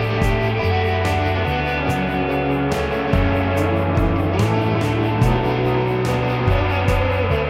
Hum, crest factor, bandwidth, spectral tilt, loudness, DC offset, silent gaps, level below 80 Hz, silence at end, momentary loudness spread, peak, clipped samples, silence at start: none; 14 dB; 15.5 kHz; -7 dB/octave; -19 LUFS; under 0.1%; none; -28 dBFS; 0 s; 2 LU; -4 dBFS; under 0.1%; 0 s